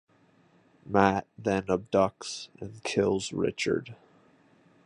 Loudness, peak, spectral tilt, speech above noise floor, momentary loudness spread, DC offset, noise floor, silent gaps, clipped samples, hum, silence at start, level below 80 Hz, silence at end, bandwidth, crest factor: -29 LUFS; -6 dBFS; -5 dB/octave; 35 dB; 13 LU; under 0.1%; -63 dBFS; none; under 0.1%; none; 0.85 s; -58 dBFS; 0.9 s; 11 kHz; 24 dB